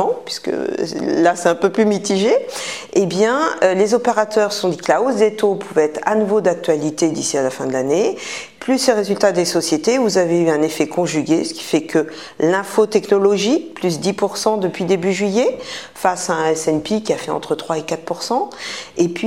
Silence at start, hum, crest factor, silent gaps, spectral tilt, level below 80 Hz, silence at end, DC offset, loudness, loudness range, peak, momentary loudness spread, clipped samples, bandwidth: 0 s; none; 16 dB; none; -4.5 dB/octave; -60 dBFS; 0 s; 0.2%; -18 LUFS; 3 LU; 0 dBFS; 7 LU; under 0.1%; 16 kHz